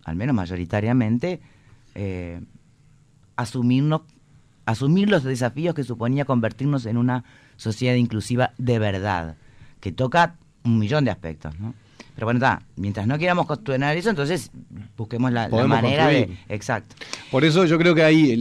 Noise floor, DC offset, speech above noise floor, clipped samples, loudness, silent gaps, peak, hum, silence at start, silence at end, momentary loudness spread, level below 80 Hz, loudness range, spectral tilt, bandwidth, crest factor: -55 dBFS; under 0.1%; 34 dB; under 0.1%; -22 LUFS; none; -8 dBFS; none; 0.05 s; 0 s; 16 LU; -50 dBFS; 5 LU; -6.5 dB/octave; 13 kHz; 14 dB